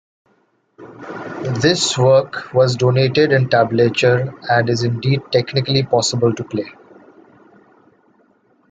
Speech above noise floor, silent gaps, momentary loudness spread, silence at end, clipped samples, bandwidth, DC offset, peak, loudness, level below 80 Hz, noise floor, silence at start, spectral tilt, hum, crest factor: 45 dB; none; 12 LU; 2 s; under 0.1%; 9.4 kHz; under 0.1%; 0 dBFS; -16 LUFS; -56 dBFS; -61 dBFS; 0.8 s; -5 dB/octave; none; 16 dB